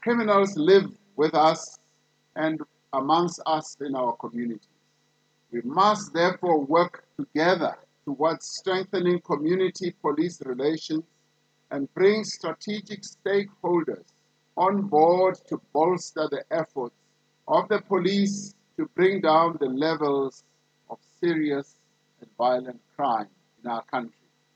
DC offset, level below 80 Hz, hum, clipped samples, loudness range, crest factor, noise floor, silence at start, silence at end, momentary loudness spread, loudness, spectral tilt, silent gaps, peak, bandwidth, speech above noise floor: under 0.1%; -82 dBFS; none; under 0.1%; 4 LU; 20 dB; -68 dBFS; 0 s; 0.45 s; 15 LU; -25 LUFS; -5.5 dB/octave; none; -6 dBFS; 8.8 kHz; 44 dB